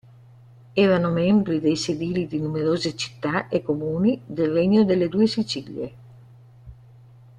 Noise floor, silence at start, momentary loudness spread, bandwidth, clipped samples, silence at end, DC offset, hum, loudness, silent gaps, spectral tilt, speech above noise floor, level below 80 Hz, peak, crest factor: -49 dBFS; 0.75 s; 9 LU; 10 kHz; under 0.1%; 0.65 s; under 0.1%; none; -22 LUFS; none; -6.5 dB/octave; 27 dB; -56 dBFS; -6 dBFS; 16 dB